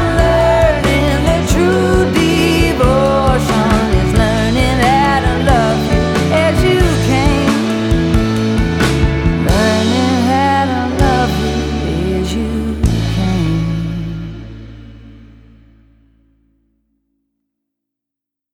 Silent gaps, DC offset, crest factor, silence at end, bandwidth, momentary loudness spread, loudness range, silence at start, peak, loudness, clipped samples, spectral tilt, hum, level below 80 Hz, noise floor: none; under 0.1%; 14 dB; 3.3 s; 18 kHz; 6 LU; 7 LU; 0 s; 0 dBFS; -13 LUFS; under 0.1%; -6 dB/octave; none; -22 dBFS; -83 dBFS